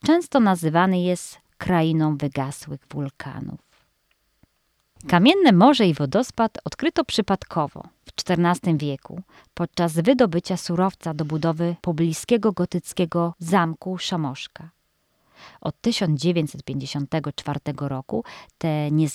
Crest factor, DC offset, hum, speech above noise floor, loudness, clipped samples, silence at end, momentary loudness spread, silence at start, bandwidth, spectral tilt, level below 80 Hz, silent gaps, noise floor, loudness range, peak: 18 dB; under 0.1%; none; 47 dB; -22 LUFS; under 0.1%; 0 s; 15 LU; 0.05 s; 13.5 kHz; -6 dB/octave; -56 dBFS; none; -69 dBFS; 7 LU; -4 dBFS